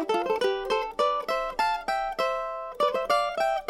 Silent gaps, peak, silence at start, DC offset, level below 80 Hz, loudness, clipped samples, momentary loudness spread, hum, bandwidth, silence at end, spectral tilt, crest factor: none; -12 dBFS; 0 s; under 0.1%; -54 dBFS; -27 LUFS; under 0.1%; 4 LU; none; 16.5 kHz; 0 s; -3 dB/octave; 16 dB